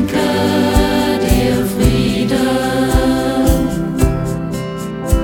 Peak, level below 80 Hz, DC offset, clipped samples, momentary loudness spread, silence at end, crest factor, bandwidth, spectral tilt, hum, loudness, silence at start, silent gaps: 0 dBFS; -22 dBFS; under 0.1%; under 0.1%; 7 LU; 0 s; 14 dB; 20 kHz; -6 dB/octave; none; -15 LUFS; 0 s; none